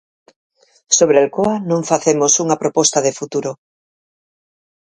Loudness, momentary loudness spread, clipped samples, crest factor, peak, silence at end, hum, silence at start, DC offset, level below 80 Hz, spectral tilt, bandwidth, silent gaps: -15 LUFS; 10 LU; under 0.1%; 18 dB; 0 dBFS; 1.3 s; none; 0.9 s; under 0.1%; -60 dBFS; -3.5 dB/octave; 10.5 kHz; none